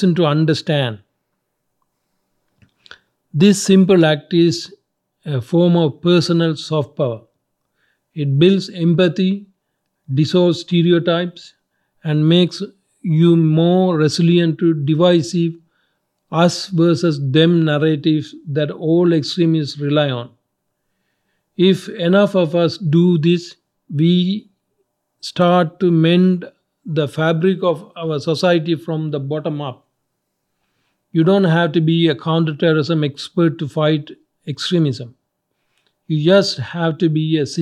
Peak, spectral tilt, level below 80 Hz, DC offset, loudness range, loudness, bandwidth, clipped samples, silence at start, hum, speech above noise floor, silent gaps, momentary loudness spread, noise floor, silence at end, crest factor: 0 dBFS; -6.5 dB/octave; -68 dBFS; under 0.1%; 4 LU; -16 LUFS; 11.5 kHz; under 0.1%; 0 s; none; 57 dB; none; 11 LU; -73 dBFS; 0 s; 16 dB